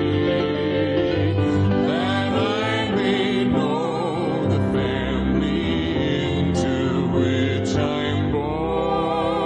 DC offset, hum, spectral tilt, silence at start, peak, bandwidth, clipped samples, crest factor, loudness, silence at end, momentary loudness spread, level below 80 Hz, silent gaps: under 0.1%; none; -7 dB/octave; 0 s; -8 dBFS; 9.4 kHz; under 0.1%; 12 dB; -21 LUFS; 0 s; 3 LU; -40 dBFS; none